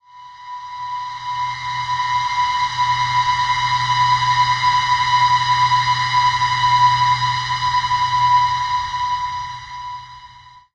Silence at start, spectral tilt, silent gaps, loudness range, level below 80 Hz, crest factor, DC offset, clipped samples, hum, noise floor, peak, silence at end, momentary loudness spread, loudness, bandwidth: 0.15 s; -1.5 dB/octave; none; 5 LU; -48 dBFS; 14 dB; under 0.1%; under 0.1%; none; -43 dBFS; -4 dBFS; 0.15 s; 15 LU; -17 LUFS; 9.4 kHz